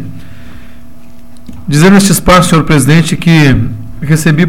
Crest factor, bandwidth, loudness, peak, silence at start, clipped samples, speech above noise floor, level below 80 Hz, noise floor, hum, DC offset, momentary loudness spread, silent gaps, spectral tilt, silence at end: 10 dB; 16.5 kHz; -7 LUFS; 0 dBFS; 0 s; 0.7%; 29 dB; -26 dBFS; -36 dBFS; none; 7%; 14 LU; none; -5.5 dB/octave; 0 s